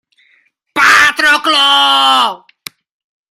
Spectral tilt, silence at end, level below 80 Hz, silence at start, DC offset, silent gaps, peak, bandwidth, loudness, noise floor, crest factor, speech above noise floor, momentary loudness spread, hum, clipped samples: 0.5 dB/octave; 0.95 s; -54 dBFS; 0.75 s; under 0.1%; none; 0 dBFS; 17 kHz; -8 LUFS; -55 dBFS; 12 dB; 45 dB; 10 LU; none; under 0.1%